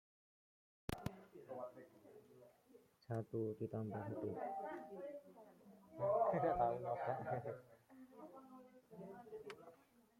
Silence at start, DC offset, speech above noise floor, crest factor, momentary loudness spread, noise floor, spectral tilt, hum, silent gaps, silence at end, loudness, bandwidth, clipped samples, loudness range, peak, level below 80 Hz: 0.9 s; under 0.1%; 27 dB; 20 dB; 25 LU; -70 dBFS; -7.5 dB/octave; none; none; 0.45 s; -44 LUFS; 16.5 kHz; under 0.1%; 8 LU; -26 dBFS; -70 dBFS